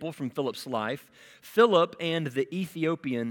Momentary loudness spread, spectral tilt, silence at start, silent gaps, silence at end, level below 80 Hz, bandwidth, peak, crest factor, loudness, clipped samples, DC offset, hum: 11 LU; -6 dB/octave; 0 s; none; 0 s; -76 dBFS; 18 kHz; -8 dBFS; 20 dB; -28 LUFS; under 0.1%; under 0.1%; none